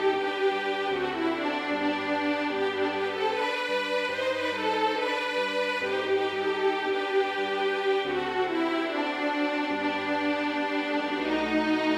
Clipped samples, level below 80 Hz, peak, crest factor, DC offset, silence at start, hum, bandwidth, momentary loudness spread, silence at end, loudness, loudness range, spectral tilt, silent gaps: under 0.1%; -64 dBFS; -14 dBFS; 14 dB; under 0.1%; 0 s; none; 12.5 kHz; 2 LU; 0 s; -27 LUFS; 1 LU; -4 dB/octave; none